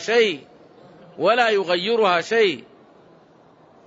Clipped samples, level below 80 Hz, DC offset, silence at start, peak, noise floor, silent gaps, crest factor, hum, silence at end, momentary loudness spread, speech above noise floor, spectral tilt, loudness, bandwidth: under 0.1%; -72 dBFS; under 0.1%; 0 s; -6 dBFS; -52 dBFS; none; 16 dB; none; 1.25 s; 5 LU; 33 dB; -3.5 dB/octave; -19 LUFS; 8 kHz